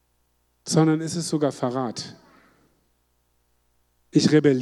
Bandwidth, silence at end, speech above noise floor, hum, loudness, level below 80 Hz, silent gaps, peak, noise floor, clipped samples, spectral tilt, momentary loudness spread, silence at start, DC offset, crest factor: 12.5 kHz; 0 s; 47 dB; 60 Hz at -55 dBFS; -23 LUFS; -68 dBFS; none; -6 dBFS; -68 dBFS; under 0.1%; -5.5 dB/octave; 16 LU; 0.65 s; under 0.1%; 20 dB